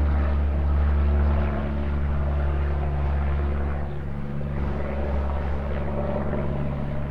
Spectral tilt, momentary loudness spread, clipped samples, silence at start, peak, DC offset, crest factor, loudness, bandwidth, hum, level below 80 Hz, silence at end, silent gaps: -10 dB/octave; 7 LU; under 0.1%; 0 s; -12 dBFS; 2%; 12 dB; -26 LUFS; 4.3 kHz; none; -26 dBFS; 0 s; none